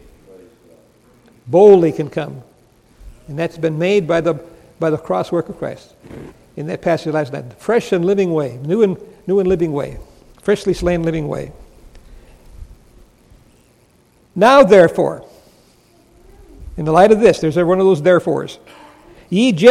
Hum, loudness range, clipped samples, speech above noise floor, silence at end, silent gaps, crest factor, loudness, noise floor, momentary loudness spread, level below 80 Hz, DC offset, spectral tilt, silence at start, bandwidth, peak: none; 8 LU; under 0.1%; 39 dB; 0 s; none; 16 dB; -15 LUFS; -53 dBFS; 20 LU; -42 dBFS; under 0.1%; -6.5 dB/octave; 1.45 s; 13 kHz; 0 dBFS